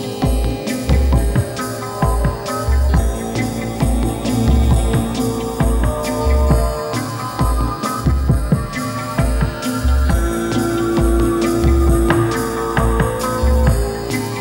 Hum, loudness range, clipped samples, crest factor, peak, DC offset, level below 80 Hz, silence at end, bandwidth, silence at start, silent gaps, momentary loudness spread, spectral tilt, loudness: none; 2 LU; under 0.1%; 16 dB; 0 dBFS; under 0.1%; -20 dBFS; 0 s; 16.5 kHz; 0 s; none; 6 LU; -6 dB/octave; -18 LUFS